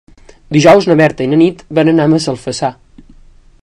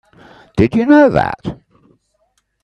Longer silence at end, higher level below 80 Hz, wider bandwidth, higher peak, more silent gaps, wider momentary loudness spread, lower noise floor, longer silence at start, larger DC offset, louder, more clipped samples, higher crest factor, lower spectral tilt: second, 0.9 s vs 1.1 s; about the same, -44 dBFS vs -42 dBFS; first, 11 kHz vs 6.6 kHz; about the same, 0 dBFS vs 0 dBFS; neither; second, 11 LU vs 16 LU; second, -41 dBFS vs -63 dBFS; about the same, 0.5 s vs 0.55 s; neither; about the same, -11 LUFS vs -13 LUFS; first, 1% vs under 0.1%; about the same, 12 dB vs 16 dB; second, -6 dB/octave vs -8 dB/octave